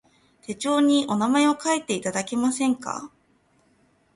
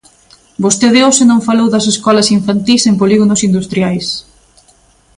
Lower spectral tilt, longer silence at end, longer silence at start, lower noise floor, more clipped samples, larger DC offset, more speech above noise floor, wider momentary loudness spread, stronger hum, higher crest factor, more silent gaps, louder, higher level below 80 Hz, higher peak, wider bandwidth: about the same, -3.5 dB/octave vs -4 dB/octave; first, 1.1 s vs 0.95 s; about the same, 0.5 s vs 0.6 s; first, -63 dBFS vs -48 dBFS; neither; neither; about the same, 41 dB vs 39 dB; first, 14 LU vs 9 LU; neither; first, 18 dB vs 12 dB; neither; second, -23 LUFS vs -10 LUFS; second, -68 dBFS vs -48 dBFS; second, -8 dBFS vs 0 dBFS; about the same, 11.5 kHz vs 11.5 kHz